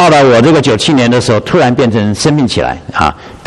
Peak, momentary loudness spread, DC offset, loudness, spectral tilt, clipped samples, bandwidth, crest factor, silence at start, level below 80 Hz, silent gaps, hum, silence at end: 0 dBFS; 8 LU; under 0.1%; -9 LUFS; -5.5 dB/octave; 0.1%; 12 kHz; 8 dB; 0 s; -34 dBFS; none; none; 0.1 s